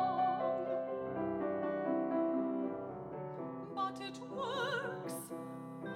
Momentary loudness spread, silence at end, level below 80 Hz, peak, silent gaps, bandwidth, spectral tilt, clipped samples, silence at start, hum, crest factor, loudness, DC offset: 10 LU; 0 s; -74 dBFS; -24 dBFS; none; 16.5 kHz; -5.5 dB/octave; under 0.1%; 0 s; none; 14 dB; -38 LUFS; under 0.1%